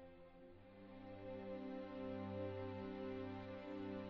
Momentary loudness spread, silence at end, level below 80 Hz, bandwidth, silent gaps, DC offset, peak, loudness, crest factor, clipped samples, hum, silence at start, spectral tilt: 14 LU; 0 s; -72 dBFS; 6.4 kHz; none; under 0.1%; -34 dBFS; -50 LUFS; 16 dB; under 0.1%; none; 0 s; -6.5 dB/octave